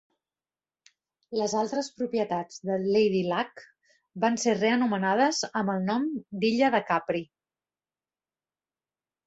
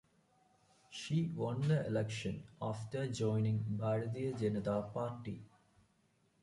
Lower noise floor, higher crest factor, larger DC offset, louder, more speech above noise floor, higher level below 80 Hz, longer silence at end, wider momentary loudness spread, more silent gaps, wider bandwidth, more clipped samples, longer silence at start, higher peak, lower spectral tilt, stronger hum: first, under -90 dBFS vs -75 dBFS; about the same, 18 dB vs 16 dB; neither; first, -27 LUFS vs -38 LUFS; first, over 64 dB vs 38 dB; about the same, -72 dBFS vs -68 dBFS; first, 2 s vs 0.95 s; about the same, 8 LU vs 10 LU; neither; second, 8.2 kHz vs 11.5 kHz; neither; first, 1.3 s vs 0.9 s; first, -10 dBFS vs -22 dBFS; second, -4.5 dB/octave vs -7 dB/octave; neither